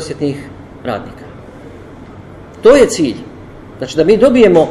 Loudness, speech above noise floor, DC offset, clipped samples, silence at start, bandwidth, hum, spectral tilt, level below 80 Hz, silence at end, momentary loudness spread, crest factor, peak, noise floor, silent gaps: -11 LUFS; 23 dB; under 0.1%; 0.3%; 0 s; 13 kHz; none; -5.5 dB/octave; -40 dBFS; 0 s; 26 LU; 14 dB; 0 dBFS; -33 dBFS; none